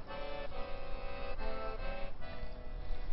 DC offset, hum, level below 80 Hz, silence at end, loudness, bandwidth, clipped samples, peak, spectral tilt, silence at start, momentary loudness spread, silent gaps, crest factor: under 0.1%; none; -42 dBFS; 0 s; -45 LUFS; 5.6 kHz; under 0.1%; -24 dBFS; -4 dB/octave; 0 s; 6 LU; none; 12 dB